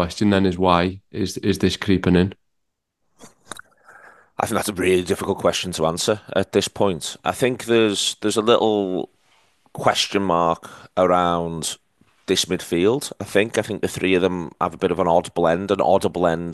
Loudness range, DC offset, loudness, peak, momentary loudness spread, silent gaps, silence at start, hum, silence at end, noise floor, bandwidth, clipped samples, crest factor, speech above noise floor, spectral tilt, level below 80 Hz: 4 LU; under 0.1%; -20 LUFS; 0 dBFS; 10 LU; none; 0 s; none; 0 s; -76 dBFS; 12.5 kHz; under 0.1%; 20 dB; 56 dB; -4.5 dB/octave; -44 dBFS